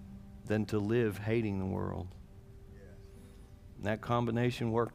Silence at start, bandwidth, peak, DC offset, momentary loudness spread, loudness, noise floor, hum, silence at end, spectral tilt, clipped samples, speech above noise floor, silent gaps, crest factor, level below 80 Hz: 0 s; 15.5 kHz; -16 dBFS; under 0.1%; 23 LU; -34 LUFS; -53 dBFS; none; 0 s; -7.5 dB/octave; under 0.1%; 20 dB; none; 18 dB; -56 dBFS